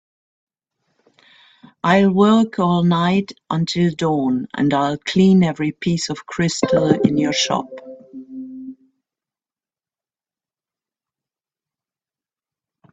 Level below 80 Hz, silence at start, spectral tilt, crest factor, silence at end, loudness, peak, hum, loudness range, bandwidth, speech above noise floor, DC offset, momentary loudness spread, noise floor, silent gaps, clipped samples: -56 dBFS; 1.85 s; -6 dB/octave; 20 dB; 4.2 s; -18 LUFS; 0 dBFS; none; 6 LU; 8 kHz; over 73 dB; under 0.1%; 20 LU; under -90 dBFS; none; under 0.1%